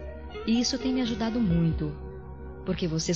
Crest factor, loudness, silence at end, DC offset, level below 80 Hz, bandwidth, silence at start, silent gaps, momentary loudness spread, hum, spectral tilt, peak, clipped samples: 14 dB; -28 LUFS; 0 s; 0.3%; -42 dBFS; 7.6 kHz; 0 s; none; 16 LU; none; -5.5 dB/octave; -14 dBFS; under 0.1%